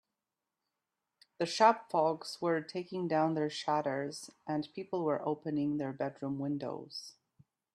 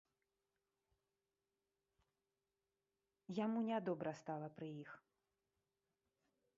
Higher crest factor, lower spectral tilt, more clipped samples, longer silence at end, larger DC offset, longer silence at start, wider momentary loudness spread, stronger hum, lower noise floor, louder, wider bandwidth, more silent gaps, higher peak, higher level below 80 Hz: about the same, 24 dB vs 20 dB; about the same, -5.5 dB/octave vs -6.5 dB/octave; neither; second, 0.65 s vs 1.6 s; neither; second, 1.4 s vs 3.3 s; second, 14 LU vs 18 LU; neither; about the same, -89 dBFS vs under -90 dBFS; first, -34 LUFS vs -45 LUFS; first, 12.5 kHz vs 7.2 kHz; neither; first, -10 dBFS vs -30 dBFS; first, -78 dBFS vs under -90 dBFS